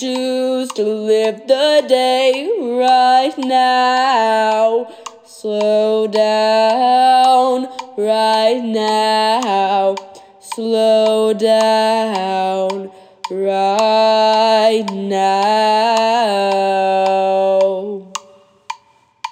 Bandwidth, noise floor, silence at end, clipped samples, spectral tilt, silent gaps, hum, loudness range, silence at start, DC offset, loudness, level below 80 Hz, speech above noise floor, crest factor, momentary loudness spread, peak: 15 kHz; -51 dBFS; 0 s; under 0.1%; -3.5 dB/octave; none; none; 2 LU; 0 s; under 0.1%; -14 LUFS; -78 dBFS; 37 dB; 14 dB; 14 LU; -2 dBFS